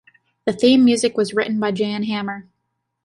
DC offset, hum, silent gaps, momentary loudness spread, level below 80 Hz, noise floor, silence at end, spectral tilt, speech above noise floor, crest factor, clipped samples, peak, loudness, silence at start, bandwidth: under 0.1%; none; none; 13 LU; -62 dBFS; -75 dBFS; 0.65 s; -4.5 dB/octave; 57 dB; 16 dB; under 0.1%; -4 dBFS; -18 LUFS; 0.45 s; 11.5 kHz